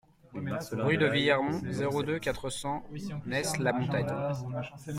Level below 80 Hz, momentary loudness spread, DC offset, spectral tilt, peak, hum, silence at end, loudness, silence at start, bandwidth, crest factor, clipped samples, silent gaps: -58 dBFS; 12 LU; under 0.1%; -5 dB/octave; -12 dBFS; none; 0 s; -31 LUFS; 0.3 s; 16 kHz; 20 dB; under 0.1%; none